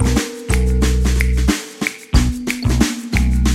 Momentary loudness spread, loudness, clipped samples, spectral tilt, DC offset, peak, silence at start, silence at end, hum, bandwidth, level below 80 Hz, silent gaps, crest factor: 4 LU; -18 LUFS; under 0.1%; -5 dB/octave; under 0.1%; 0 dBFS; 0 s; 0 s; none; 15 kHz; -18 dBFS; none; 16 dB